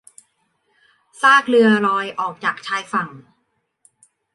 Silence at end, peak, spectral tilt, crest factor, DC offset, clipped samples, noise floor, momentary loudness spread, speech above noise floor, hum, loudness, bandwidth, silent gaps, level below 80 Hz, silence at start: 1.15 s; -2 dBFS; -4.5 dB/octave; 18 dB; under 0.1%; under 0.1%; -70 dBFS; 12 LU; 53 dB; none; -17 LUFS; 11.5 kHz; none; -72 dBFS; 1.2 s